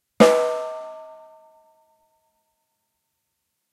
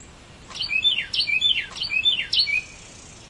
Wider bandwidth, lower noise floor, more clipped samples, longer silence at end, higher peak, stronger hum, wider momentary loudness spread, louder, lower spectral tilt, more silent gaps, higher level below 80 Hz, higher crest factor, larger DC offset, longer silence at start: first, 13.5 kHz vs 11.5 kHz; first, -77 dBFS vs -45 dBFS; neither; first, 2.6 s vs 0 s; first, -2 dBFS vs -8 dBFS; neither; first, 25 LU vs 9 LU; about the same, -19 LUFS vs -20 LUFS; first, -4.5 dB/octave vs 0 dB/octave; neither; second, -66 dBFS vs -52 dBFS; first, 24 dB vs 16 dB; neither; first, 0.2 s vs 0 s